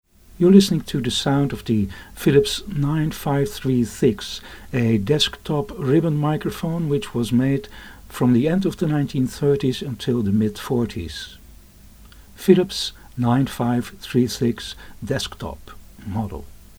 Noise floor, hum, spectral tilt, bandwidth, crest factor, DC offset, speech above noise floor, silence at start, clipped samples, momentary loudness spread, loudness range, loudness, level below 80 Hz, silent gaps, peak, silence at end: -46 dBFS; none; -6 dB/octave; over 20 kHz; 20 dB; under 0.1%; 25 dB; 0.35 s; under 0.1%; 14 LU; 3 LU; -21 LUFS; -44 dBFS; none; 0 dBFS; 0.25 s